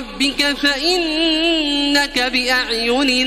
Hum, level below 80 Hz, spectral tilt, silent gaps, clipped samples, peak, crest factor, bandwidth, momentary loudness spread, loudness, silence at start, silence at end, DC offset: none; -40 dBFS; -1.5 dB/octave; none; under 0.1%; -2 dBFS; 16 dB; 16 kHz; 1 LU; -16 LUFS; 0 s; 0 s; under 0.1%